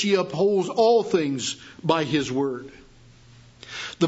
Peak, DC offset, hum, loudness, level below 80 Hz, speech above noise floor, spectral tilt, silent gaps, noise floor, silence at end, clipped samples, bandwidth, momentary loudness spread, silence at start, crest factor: -6 dBFS; under 0.1%; none; -23 LUFS; -60 dBFS; 28 dB; -5 dB/octave; none; -51 dBFS; 0 s; under 0.1%; 8 kHz; 15 LU; 0 s; 18 dB